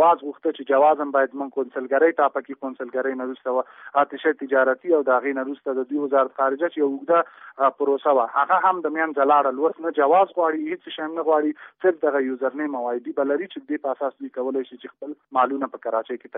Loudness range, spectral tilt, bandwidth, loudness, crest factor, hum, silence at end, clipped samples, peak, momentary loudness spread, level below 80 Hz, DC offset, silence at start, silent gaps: 6 LU; -2 dB/octave; 3.9 kHz; -22 LUFS; 16 dB; none; 0 s; under 0.1%; -6 dBFS; 10 LU; -82 dBFS; under 0.1%; 0 s; none